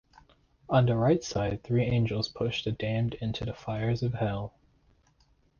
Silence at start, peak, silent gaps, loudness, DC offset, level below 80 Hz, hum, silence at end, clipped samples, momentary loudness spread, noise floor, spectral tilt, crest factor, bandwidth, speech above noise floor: 0.7 s; -12 dBFS; none; -29 LUFS; under 0.1%; -52 dBFS; none; 1.1 s; under 0.1%; 9 LU; -66 dBFS; -7 dB/octave; 18 dB; 7.2 kHz; 38 dB